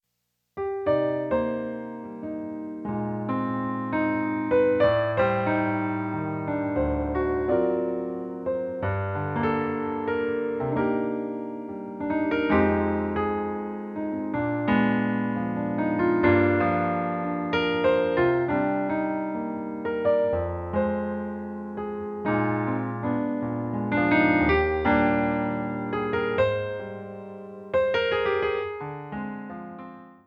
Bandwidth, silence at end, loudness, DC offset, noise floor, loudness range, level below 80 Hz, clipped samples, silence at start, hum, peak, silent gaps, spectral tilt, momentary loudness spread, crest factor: 5.4 kHz; 0.15 s; -26 LUFS; under 0.1%; -78 dBFS; 5 LU; -48 dBFS; under 0.1%; 0.55 s; none; -8 dBFS; none; -9 dB/octave; 12 LU; 18 dB